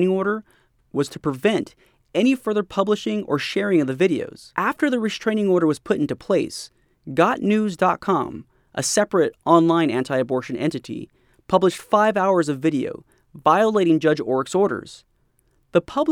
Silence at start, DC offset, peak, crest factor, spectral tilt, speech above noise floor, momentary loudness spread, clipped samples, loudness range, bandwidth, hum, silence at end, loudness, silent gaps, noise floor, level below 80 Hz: 0 s; under 0.1%; -2 dBFS; 20 dB; -5.5 dB/octave; 43 dB; 12 LU; under 0.1%; 2 LU; 15.5 kHz; none; 0 s; -21 LUFS; none; -63 dBFS; -60 dBFS